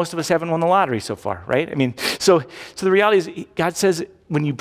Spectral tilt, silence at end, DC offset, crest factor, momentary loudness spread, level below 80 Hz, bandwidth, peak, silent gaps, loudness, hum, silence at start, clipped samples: -5 dB/octave; 0.05 s; under 0.1%; 16 dB; 10 LU; -54 dBFS; 16 kHz; -4 dBFS; none; -20 LUFS; none; 0 s; under 0.1%